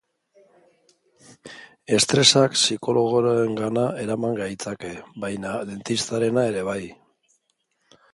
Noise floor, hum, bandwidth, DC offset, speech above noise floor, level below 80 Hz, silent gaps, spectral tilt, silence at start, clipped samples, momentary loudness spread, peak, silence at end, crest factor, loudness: -72 dBFS; none; 11.5 kHz; under 0.1%; 49 dB; -60 dBFS; none; -3.5 dB/octave; 1.45 s; under 0.1%; 20 LU; -2 dBFS; 1.2 s; 22 dB; -22 LUFS